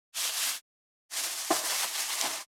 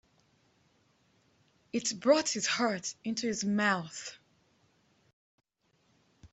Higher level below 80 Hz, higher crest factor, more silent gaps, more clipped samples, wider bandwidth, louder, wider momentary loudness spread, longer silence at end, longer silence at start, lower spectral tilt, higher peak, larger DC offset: second, under -90 dBFS vs -76 dBFS; about the same, 22 dB vs 24 dB; first, 0.61-1.09 s vs 5.13-5.38 s; neither; first, over 20 kHz vs 8.2 kHz; about the same, -30 LUFS vs -31 LUFS; second, 6 LU vs 13 LU; about the same, 0.05 s vs 0.05 s; second, 0.15 s vs 1.75 s; second, 1.5 dB/octave vs -3 dB/octave; about the same, -10 dBFS vs -12 dBFS; neither